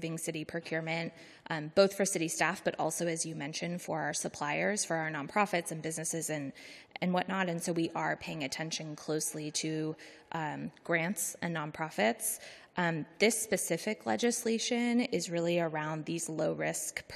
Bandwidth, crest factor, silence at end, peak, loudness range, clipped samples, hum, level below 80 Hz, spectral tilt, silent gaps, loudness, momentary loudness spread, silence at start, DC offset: 14 kHz; 22 dB; 0 s; -12 dBFS; 4 LU; under 0.1%; none; -74 dBFS; -3.5 dB/octave; none; -33 LUFS; 8 LU; 0 s; under 0.1%